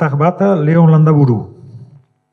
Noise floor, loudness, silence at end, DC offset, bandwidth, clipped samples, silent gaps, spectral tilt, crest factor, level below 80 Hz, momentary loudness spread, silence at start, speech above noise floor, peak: -42 dBFS; -11 LUFS; 0.5 s; under 0.1%; 4.6 kHz; under 0.1%; none; -10.5 dB/octave; 12 dB; -60 dBFS; 9 LU; 0 s; 32 dB; 0 dBFS